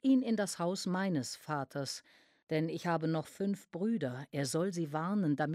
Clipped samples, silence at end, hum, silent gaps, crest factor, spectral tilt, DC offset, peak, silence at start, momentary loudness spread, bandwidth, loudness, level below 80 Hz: under 0.1%; 0 s; none; 2.43-2.47 s; 16 dB; -5.5 dB/octave; under 0.1%; -20 dBFS; 0.05 s; 6 LU; 15 kHz; -35 LUFS; -80 dBFS